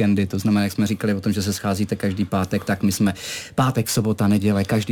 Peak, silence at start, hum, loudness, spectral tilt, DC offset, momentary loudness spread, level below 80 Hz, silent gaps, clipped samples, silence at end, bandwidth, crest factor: -6 dBFS; 0 s; none; -21 LUFS; -5.5 dB/octave; under 0.1%; 4 LU; -50 dBFS; none; under 0.1%; 0 s; 18.5 kHz; 14 dB